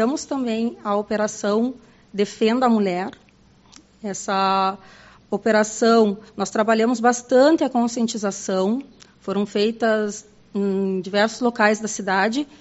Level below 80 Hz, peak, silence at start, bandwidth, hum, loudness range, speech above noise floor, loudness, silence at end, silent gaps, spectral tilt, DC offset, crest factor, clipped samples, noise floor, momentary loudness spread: -62 dBFS; -2 dBFS; 0 s; 8 kHz; none; 4 LU; 32 dB; -21 LUFS; 0.15 s; none; -4 dB/octave; under 0.1%; 20 dB; under 0.1%; -52 dBFS; 11 LU